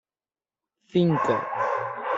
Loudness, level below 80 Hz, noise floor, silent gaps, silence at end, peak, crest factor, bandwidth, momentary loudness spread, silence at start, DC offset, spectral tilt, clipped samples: -25 LUFS; -68 dBFS; under -90 dBFS; none; 0 s; -10 dBFS; 16 dB; 7.6 kHz; 6 LU; 0.95 s; under 0.1%; -7.5 dB/octave; under 0.1%